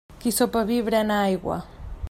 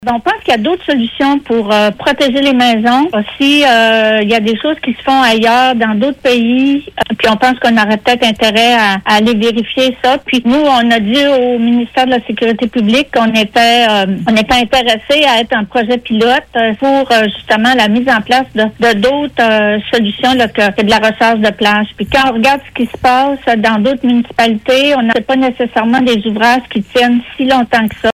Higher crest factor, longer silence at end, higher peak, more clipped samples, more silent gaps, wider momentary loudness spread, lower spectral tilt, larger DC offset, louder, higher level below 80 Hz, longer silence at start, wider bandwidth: first, 16 dB vs 10 dB; about the same, 0 s vs 0 s; second, -8 dBFS vs 0 dBFS; neither; neither; first, 12 LU vs 5 LU; about the same, -4.5 dB/octave vs -4.5 dB/octave; neither; second, -24 LUFS vs -10 LUFS; about the same, -42 dBFS vs -42 dBFS; about the same, 0.1 s vs 0 s; about the same, 16 kHz vs 15.5 kHz